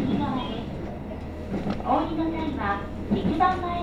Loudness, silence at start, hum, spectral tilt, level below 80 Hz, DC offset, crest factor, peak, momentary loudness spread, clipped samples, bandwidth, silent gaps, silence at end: -27 LUFS; 0 s; none; -8 dB/octave; -42 dBFS; under 0.1%; 18 dB; -8 dBFS; 12 LU; under 0.1%; 10.5 kHz; none; 0 s